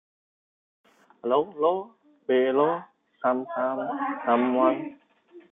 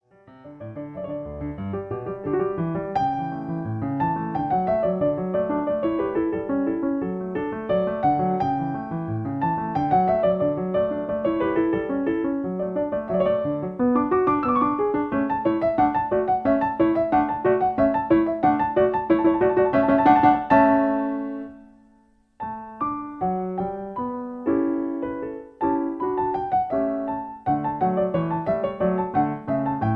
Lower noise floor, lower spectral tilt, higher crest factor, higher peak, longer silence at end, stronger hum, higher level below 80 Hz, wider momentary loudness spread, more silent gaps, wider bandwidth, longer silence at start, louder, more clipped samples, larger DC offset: second, -53 dBFS vs -59 dBFS; second, -8.5 dB/octave vs -10 dB/octave; about the same, 20 dB vs 18 dB; second, -8 dBFS vs -4 dBFS; about the same, 0.1 s vs 0 s; neither; second, -80 dBFS vs -50 dBFS; about the same, 12 LU vs 10 LU; neither; second, 3.9 kHz vs 5.2 kHz; first, 1.25 s vs 0.3 s; second, -26 LUFS vs -23 LUFS; neither; neither